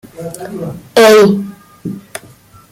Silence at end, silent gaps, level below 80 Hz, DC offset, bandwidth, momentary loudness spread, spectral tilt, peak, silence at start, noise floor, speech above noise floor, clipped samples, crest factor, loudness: 0.55 s; none; -52 dBFS; under 0.1%; 16.5 kHz; 23 LU; -4.5 dB/octave; 0 dBFS; 0.2 s; -41 dBFS; 31 dB; under 0.1%; 14 dB; -8 LUFS